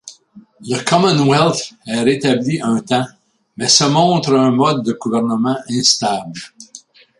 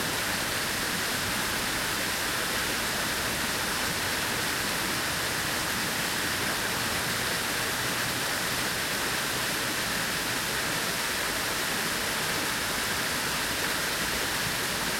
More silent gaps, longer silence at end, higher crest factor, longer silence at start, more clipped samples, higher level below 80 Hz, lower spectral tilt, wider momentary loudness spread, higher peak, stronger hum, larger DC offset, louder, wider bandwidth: neither; first, 0.45 s vs 0 s; about the same, 16 dB vs 14 dB; about the same, 0.05 s vs 0 s; neither; second, -58 dBFS vs -50 dBFS; first, -4 dB/octave vs -1.5 dB/octave; first, 11 LU vs 0 LU; first, 0 dBFS vs -14 dBFS; neither; neither; first, -15 LUFS vs -27 LUFS; second, 11.5 kHz vs 16.5 kHz